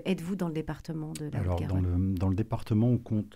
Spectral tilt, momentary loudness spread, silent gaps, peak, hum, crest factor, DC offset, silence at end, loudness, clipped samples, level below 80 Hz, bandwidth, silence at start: -8 dB/octave; 9 LU; none; -16 dBFS; none; 12 dB; 0.1%; 0.05 s; -30 LUFS; under 0.1%; -48 dBFS; 15 kHz; 0 s